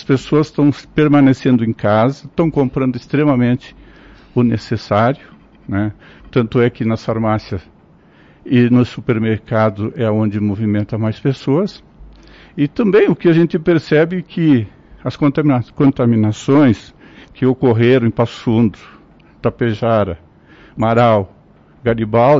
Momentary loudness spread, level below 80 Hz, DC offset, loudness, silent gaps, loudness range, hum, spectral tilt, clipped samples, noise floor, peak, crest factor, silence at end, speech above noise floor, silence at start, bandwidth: 10 LU; -46 dBFS; under 0.1%; -15 LUFS; none; 4 LU; none; -8.5 dB/octave; under 0.1%; -47 dBFS; -4 dBFS; 12 dB; 0 s; 33 dB; 0 s; 7.8 kHz